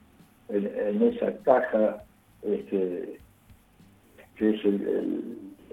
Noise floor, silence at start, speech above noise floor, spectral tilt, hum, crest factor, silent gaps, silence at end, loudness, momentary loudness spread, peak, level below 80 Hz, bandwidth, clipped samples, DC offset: -57 dBFS; 0.5 s; 31 dB; -8.5 dB/octave; none; 24 dB; none; 0.2 s; -27 LUFS; 17 LU; -6 dBFS; -64 dBFS; 13.5 kHz; under 0.1%; under 0.1%